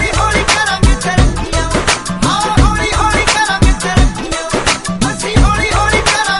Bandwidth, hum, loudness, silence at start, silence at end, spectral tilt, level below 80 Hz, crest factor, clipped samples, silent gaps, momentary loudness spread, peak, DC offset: 11.5 kHz; none; -12 LUFS; 0 s; 0 s; -4 dB/octave; -18 dBFS; 12 dB; under 0.1%; none; 4 LU; 0 dBFS; under 0.1%